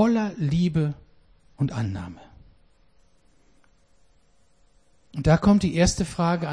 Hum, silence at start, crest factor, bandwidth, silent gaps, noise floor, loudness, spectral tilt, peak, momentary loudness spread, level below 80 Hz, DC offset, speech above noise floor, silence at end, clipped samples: none; 0 s; 18 dB; 10.5 kHz; none; -63 dBFS; -23 LUFS; -6.5 dB/octave; -8 dBFS; 16 LU; -42 dBFS; under 0.1%; 41 dB; 0 s; under 0.1%